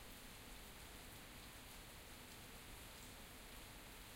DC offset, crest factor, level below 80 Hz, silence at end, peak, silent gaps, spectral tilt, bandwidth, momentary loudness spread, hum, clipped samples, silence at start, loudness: under 0.1%; 14 dB; -64 dBFS; 0 s; -42 dBFS; none; -2.5 dB/octave; 16 kHz; 1 LU; none; under 0.1%; 0 s; -56 LUFS